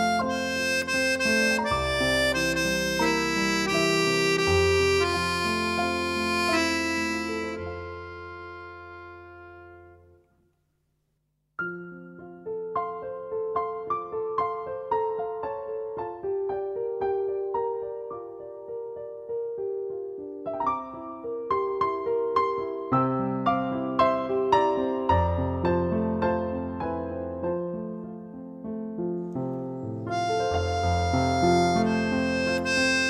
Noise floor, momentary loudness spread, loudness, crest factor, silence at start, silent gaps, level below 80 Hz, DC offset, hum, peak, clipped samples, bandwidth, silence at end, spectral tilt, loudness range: -74 dBFS; 16 LU; -26 LUFS; 20 dB; 0 s; none; -48 dBFS; under 0.1%; none; -8 dBFS; under 0.1%; 15.5 kHz; 0 s; -4.5 dB/octave; 13 LU